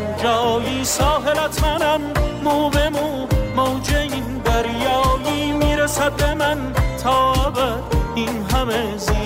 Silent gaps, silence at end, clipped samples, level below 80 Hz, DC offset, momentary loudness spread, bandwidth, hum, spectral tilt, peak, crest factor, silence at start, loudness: none; 0 s; under 0.1%; -26 dBFS; under 0.1%; 4 LU; 16 kHz; none; -4.5 dB/octave; -8 dBFS; 10 dB; 0 s; -19 LUFS